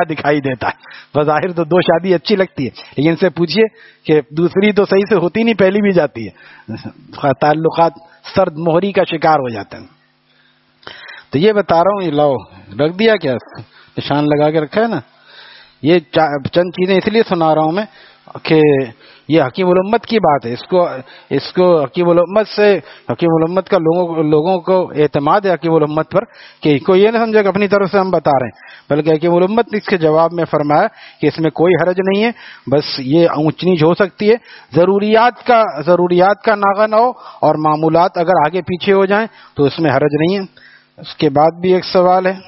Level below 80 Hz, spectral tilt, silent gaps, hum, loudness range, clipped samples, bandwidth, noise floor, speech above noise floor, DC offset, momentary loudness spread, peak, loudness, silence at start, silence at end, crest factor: -54 dBFS; -5 dB/octave; none; none; 4 LU; under 0.1%; 6 kHz; -54 dBFS; 41 dB; under 0.1%; 9 LU; 0 dBFS; -14 LUFS; 0 s; 0.05 s; 14 dB